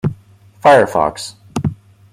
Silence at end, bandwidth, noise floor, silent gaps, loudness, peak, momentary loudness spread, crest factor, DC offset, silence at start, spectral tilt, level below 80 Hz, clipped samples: 0.4 s; 15.5 kHz; -45 dBFS; none; -15 LUFS; 0 dBFS; 14 LU; 16 dB; under 0.1%; 0.05 s; -5.5 dB/octave; -48 dBFS; under 0.1%